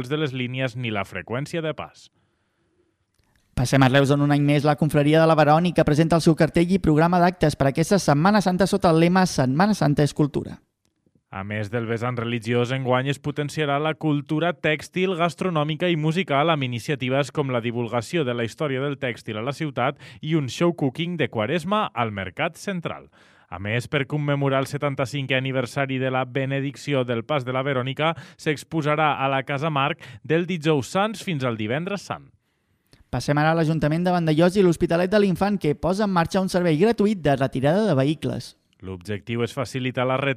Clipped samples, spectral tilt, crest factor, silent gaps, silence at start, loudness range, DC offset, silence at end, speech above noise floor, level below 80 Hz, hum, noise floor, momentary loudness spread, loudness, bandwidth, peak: under 0.1%; -6.5 dB/octave; 18 dB; none; 0 s; 7 LU; under 0.1%; 0 s; 47 dB; -50 dBFS; none; -69 dBFS; 11 LU; -22 LUFS; 15 kHz; -4 dBFS